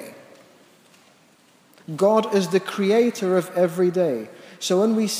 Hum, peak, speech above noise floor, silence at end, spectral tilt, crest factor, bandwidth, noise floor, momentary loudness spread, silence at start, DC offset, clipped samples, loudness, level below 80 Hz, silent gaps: none; -6 dBFS; 36 dB; 0 s; -5.5 dB/octave; 16 dB; 16 kHz; -56 dBFS; 11 LU; 0 s; under 0.1%; under 0.1%; -21 LUFS; -82 dBFS; none